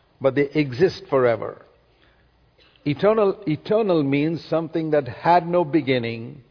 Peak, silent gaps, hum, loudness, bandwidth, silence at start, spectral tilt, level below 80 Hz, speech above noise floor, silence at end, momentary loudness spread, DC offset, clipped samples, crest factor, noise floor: -4 dBFS; none; none; -21 LUFS; 5.4 kHz; 0.2 s; -8 dB/octave; -58 dBFS; 38 dB; 0.1 s; 9 LU; under 0.1%; under 0.1%; 18 dB; -59 dBFS